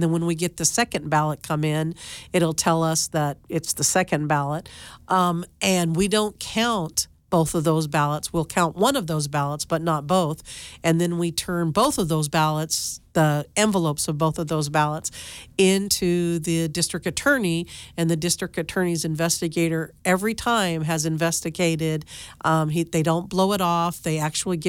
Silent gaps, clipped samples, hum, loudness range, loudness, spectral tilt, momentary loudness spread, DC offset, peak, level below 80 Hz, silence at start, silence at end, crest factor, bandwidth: none; under 0.1%; none; 1 LU; -23 LUFS; -4.5 dB/octave; 6 LU; under 0.1%; -6 dBFS; -50 dBFS; 0 s; 0 s; 18 dB; 17 kHz